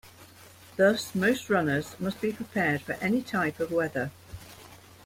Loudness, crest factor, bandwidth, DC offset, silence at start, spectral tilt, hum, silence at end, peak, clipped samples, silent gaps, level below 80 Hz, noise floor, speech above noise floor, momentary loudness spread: -28 LUFS; 20 dB; 16.5 kHz; under 0.1%; 0.05 s; -5.5 dB/octave; none; 0.3 s; -8 dBFS; under 0.1%; none; -60 dBFS; -52 dBFS; 24 dB; 21 LU